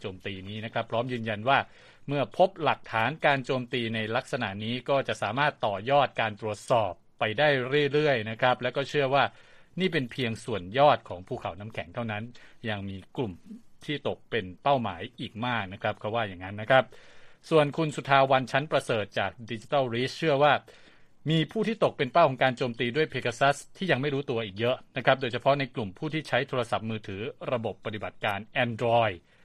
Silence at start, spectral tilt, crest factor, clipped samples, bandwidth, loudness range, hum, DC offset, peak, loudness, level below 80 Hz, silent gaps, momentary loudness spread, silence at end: 0 s; -6 dB/octave; 22 dB; under 0.1%; 12.5 kHz; 5 LU; none; under 0.1%; -6 dBFS; -28 LUFS; -62 dBFS; none; 12 LU; 0.25 s